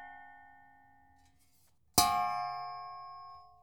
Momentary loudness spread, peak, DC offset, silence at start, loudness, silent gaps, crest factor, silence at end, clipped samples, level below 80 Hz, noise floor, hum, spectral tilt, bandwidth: 25 LU; -8 dBFS; under 0.1%; 0 s; -32 LUFS; none; 30 dB; 0.15 s; under 0.1%; -62 dBFS; -71 dBFS; none; -1.5 dB/octave; over 20 kHz